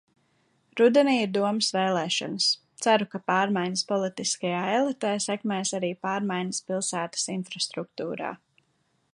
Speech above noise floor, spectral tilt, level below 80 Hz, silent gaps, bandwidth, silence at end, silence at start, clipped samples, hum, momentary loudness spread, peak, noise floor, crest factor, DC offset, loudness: 45 dB; -3.5 dB/octave; -78 dBFS; none; 11.5 kHz; 0.8 s; 0.75 s; under 0.1%; none; 8 LU; -8 dBFS; -71 dBFS; 20 dB; under 0.1%; -26 LUFS